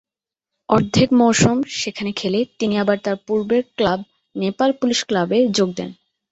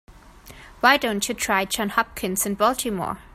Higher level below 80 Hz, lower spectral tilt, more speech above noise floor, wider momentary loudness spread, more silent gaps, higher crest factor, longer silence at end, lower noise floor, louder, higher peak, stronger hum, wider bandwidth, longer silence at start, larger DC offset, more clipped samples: about the same, -50 dBFS vs -50 dBFS; first, -5 dB/octave vs -2.5 dB/octave; first, 68 dB vs 23 dB; about the same, 10 LU vs 8 LU; neither; about the same, 18 dB vs 20 dB; first, 0.4 s vs 0.05 s; first, -86 dBFS vs -46 dBFS; first, -19 LUFS vs -22 LUFS; about the same, -2 dBFS vs -4 dBFS; neither; second, 8.2 kHz vs 16 kHz; first, 0.7 s vs 0.1 s; neither; neither